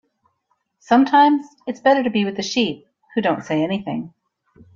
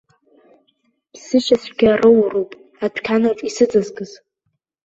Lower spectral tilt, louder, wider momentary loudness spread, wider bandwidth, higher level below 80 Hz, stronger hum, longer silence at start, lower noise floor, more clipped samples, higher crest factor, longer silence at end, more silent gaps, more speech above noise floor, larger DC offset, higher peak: about the same, -5 dB/octave vs -5 dB/octave; about the same, -19 LUFS vs -17 LUFS; about the same, 15 LU vs 16 LU; about the same, 7.4 kHz vs 8 kHz; second, -64 dBFS vs -54 dBFS; neither; second, 0.9 s vs 1.15 s; about the same, -70 dBFS vs -72 dBFS; neither; about the same, 18 dB vs 16 dB; about the same, 0.65 s vs 0.75 s; neither; second, 52 dB vs 56 dB; neither; about the same, -2 dBFS vs -2 dBFS